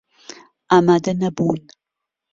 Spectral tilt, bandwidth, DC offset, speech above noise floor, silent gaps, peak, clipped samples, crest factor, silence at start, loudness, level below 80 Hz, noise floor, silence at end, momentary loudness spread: -6.5 dB/octave; 7.6 kHz; under 0.1%; 66 dB; none; -2 dBFS; under 0.1%; 18 dB; 0.7 s; -18 LUFS; -58 dBFS; -83 dBFS; 0.75 s; 8 LU